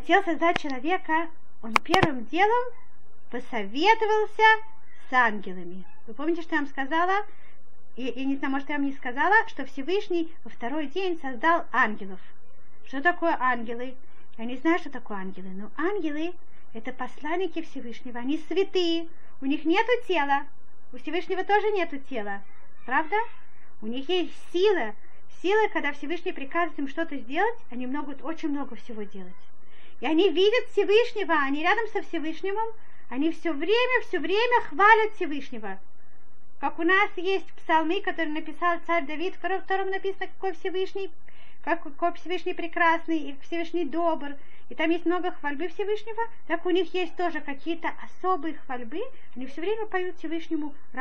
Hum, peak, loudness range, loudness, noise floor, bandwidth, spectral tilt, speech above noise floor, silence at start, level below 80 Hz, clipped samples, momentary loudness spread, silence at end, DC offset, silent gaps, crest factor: none; 0 dBFS; 7 LU; -27 LUFS; -61 dBFS; 8.4 kHz; -5 dB/octave; 34 dB; 0.05 s; -66 dBFS; under 0.1%; 16 LU; 0 s; 4%; none; 26 dB